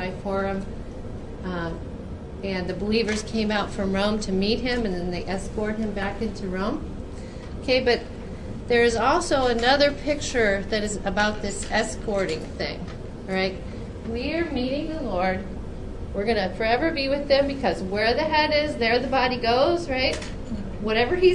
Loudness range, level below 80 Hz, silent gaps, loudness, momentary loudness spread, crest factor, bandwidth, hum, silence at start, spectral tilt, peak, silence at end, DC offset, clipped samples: 6 LU; -38 dBFS; none; -24 LUFS; 15 LU; 18 dB; 11.5 kHz; none; 0 s; -5 dB/octave; -6 dBFS; 0 s; under 0.1%; under 0.1%